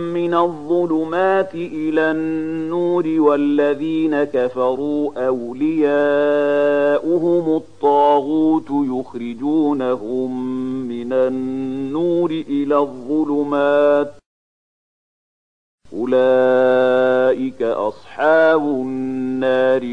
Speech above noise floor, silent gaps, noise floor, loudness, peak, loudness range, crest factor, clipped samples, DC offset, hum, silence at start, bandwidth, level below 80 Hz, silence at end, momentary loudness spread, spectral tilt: over 73 dB; 14.26-15.78 s; under -90 dBFS; -18 LUFS; -2 dBFS; 4 LU; 14 dB; under 0.1%; 0.7%; none; 0 s; 9.4 kHz; -60 dBFS; 0 s; 9 LU; -7.5 dB/octave